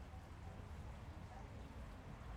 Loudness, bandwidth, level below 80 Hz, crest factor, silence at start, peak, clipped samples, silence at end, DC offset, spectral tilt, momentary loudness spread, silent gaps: -55 LUFS; 16.5 kHz; -56 dBFS; 14 dB; 0 s; -40 dBFS; under 0.1%; 0 s; under 0.1%; -6.5 dB/octave; 1 LU; none